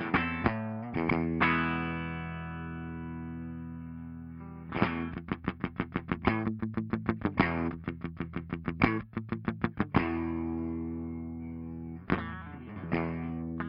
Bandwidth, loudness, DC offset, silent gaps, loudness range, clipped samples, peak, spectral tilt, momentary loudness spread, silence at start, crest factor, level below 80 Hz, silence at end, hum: 5.4 kHz; -33 LUFS; under 0.1%; none; 5 LU; under 0.1%; -8 dBFS; -9.5 dB/octave; 12 LU; 0 s; 24 dB; -52 dBFS; 0 s; none